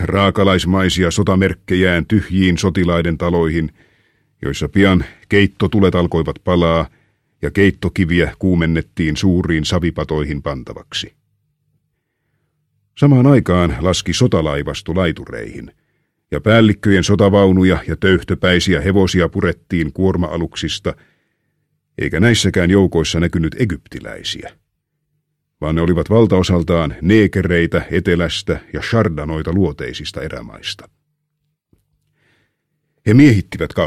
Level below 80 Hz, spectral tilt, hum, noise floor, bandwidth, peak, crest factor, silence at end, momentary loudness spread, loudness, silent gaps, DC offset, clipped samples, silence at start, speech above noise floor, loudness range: -34 dBFS; -6 dB/octave; none; -71 dBFS; 13 kHz; 0 dBFS; 16 dB; 0 s; 13 LU; -15 LUFS; none; under 0.1%; under 0.1%; 0 s; 57 dB; 6 LU